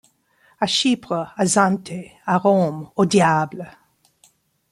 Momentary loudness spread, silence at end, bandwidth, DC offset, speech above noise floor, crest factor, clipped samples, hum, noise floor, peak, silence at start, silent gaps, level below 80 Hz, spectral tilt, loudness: 13 LU; 1 s; 12.5 kHz; under 0.1%; 40 dB; 18 dB; under 0.1%; none; -59 dBFS; -2 dBFS; 0.6 s; none; -62 dBFS; -4.5 dB/octave; -19 LUFS